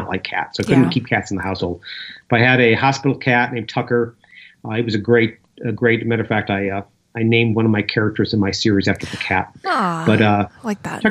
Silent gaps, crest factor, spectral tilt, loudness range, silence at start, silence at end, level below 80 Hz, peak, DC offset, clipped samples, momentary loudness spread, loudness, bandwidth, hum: none; 18 dB; -6 dB/octave; 3 LU; 0 s; 0 s; -52 dBFS; 0 dBFS; under 0.1%; under 0.1%; 11 LU; -18 LUFS; 11 kHz; none